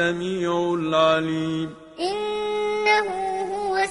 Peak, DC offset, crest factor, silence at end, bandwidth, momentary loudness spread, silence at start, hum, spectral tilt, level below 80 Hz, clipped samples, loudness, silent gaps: -6 dBFS; under 0.1%; 18 dB; 0 s; 11 kHz; 8 LU; 0 s; none; -5 dB/octave; -58 dBFS; under 0.1%; -23 LUFS; none